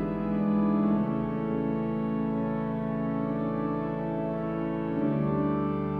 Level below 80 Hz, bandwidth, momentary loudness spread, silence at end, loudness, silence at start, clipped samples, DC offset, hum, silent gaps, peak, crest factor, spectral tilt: -50 dBFS; 4.3 kHz; 5 LU; 0 s; -29 LUFS; 0 s; under 0.1%; under 0.1%; none; none; -16 dBFS; 12 dB; -11 dB/octave